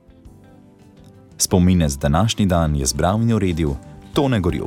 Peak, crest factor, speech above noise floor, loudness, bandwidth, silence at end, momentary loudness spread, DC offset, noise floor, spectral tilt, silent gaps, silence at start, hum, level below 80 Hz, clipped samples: -4 dBFS; 16 dB; 29 dB; -18 LUFS; 17.5 kHz; 0 s; 7 LU; under 0.1%; -47 dBFS; -5.5 dB/octave; none; 0.25 s; none; -32 dBFS; under 0.1%